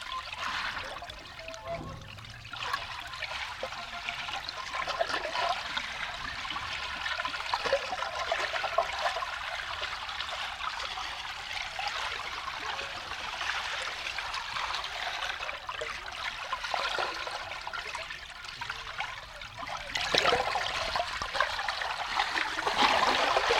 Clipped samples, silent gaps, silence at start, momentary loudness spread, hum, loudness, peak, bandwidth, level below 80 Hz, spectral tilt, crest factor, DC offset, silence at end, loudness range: under 0.1%; none; 0 s; 10 LU; none; -32 LUFS; -8 dBFS; 17 kHz; -54 dBFS; -1.5 dB/octave; 26 dB; under 0.1%; 0 s; 7 LU